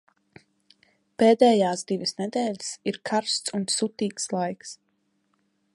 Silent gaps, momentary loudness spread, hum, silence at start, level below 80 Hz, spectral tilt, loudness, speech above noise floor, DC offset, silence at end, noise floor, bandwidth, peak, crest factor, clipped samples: none; 13 LU; none; 1.2 s; -74 dBFS; -4 dB/octave; -24 LUFS; 47 dB; under 0.1%; 1 s; -71 dBFS; 11.5 kHz; -6 dBFS; 22 dB; under 0.1%